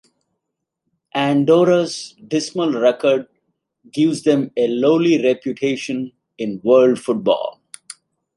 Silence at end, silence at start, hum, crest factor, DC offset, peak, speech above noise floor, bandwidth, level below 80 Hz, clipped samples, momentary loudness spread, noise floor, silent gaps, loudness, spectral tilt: 0.45 s; 1.15 s; none; 16 dB; under 0.1%; -2 dBFS; 62 dB; 11.5 kHz; -68 dBFS; under 0.1%; 14 LU; -79 dBFS; none; -18 LUFS; -5.5 dB/octave